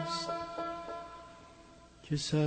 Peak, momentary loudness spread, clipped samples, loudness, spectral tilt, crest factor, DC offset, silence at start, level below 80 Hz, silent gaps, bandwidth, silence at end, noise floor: -20 dBFS; 20 LU; under 0.1%; -38 LUFS; -5 dB/octave; 18 dB; under 0.1%; 0 s; -62 dBFS; none; 8.8 kHz; 0 s; -57 dBFS